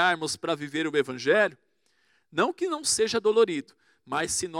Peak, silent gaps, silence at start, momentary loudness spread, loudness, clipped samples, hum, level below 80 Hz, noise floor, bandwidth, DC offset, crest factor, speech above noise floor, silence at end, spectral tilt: -10 dBFS; none; 0 s; 7 LU; -26 LUFS; under 0.1%; none; -66 dBFS; -69 dBFS; 15.5 kHz; under 0.1%; 18 dB; 43 dB; 0 s; -2.5 dB/octave